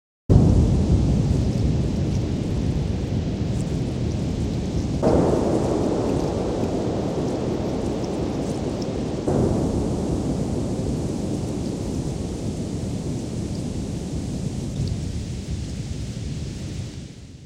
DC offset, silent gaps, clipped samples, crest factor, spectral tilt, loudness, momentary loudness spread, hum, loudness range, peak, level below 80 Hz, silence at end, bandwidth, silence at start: under 0.1%; none; under 0.1%; 22 dB; -7.5 dB/octave; -24 LUFS; 10 LU; none; 6 LU; 0 dBFS; -32 dBFS; 0 s; 12.5 kHz; 0.3 s